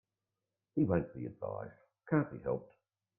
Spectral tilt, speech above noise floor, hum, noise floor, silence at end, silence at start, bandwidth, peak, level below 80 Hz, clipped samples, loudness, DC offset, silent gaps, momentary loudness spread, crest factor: -13 dB/octave; 55 dB; none; -90 dBFS; 0.55 s; 0.75 s; 2.9 kHz; -18 dBFS; -66 dBFS; under 0.1%; -37 LUFS; under 0.1%; none; 11 LU; 20 dB